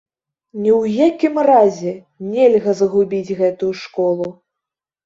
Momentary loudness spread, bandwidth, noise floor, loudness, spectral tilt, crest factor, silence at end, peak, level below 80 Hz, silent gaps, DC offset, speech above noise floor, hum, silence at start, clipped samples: 13 LU; 7.8 kHz; -84 dBFS; -16 LUFS; -7 dB/octave; 16 dB; 0.75 s; -2 dBFS; -62 dBFS; none; under 0.1%; 69 dB; none; 0.55 s; under 0.1%